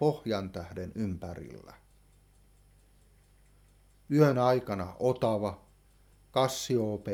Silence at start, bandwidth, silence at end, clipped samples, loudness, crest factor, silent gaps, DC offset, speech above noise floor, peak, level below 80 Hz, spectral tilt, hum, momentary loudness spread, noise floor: 0 s; 17.5 kHz; 0 s; under 0.1%; -30 LUFS; 22 dB; none; under 0.1%; 32 dB; -10 dBFS; -60 dBFS; -6 dB/octave; none; 17 LU; -62 dBFS